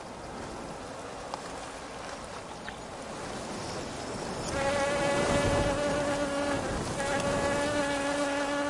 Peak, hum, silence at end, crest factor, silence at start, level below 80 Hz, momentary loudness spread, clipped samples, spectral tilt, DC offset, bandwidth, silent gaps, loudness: -16 dBFS; none; 0 s; 16 dB; 0 s; -48 dBFS; 13 LU; under 0.1%; -4 dB/octave; under 0.1%; 11.5 kHz; none; -32 LUFS